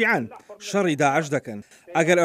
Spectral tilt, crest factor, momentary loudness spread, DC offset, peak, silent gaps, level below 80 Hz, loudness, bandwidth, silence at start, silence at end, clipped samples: -5 dB/octave; 20 dB; 17 LU; under 0.1%; -4 dBFS; none; -72 dBFS; -23 LUFS; 15.5 kHz; 0 s; 0 s; under 0.1%